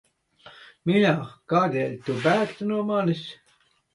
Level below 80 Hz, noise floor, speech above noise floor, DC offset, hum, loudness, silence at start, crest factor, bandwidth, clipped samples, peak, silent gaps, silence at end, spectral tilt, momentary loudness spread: -68 dBFS; -64 dBFS; 41 dB; under 0.1%; none; -24 LUFS; 0.45 s; 18 dB; 11 kHz; under 0.1%; -8 dBFS; none; 0.6 s; -7 dB/octave; 9 LU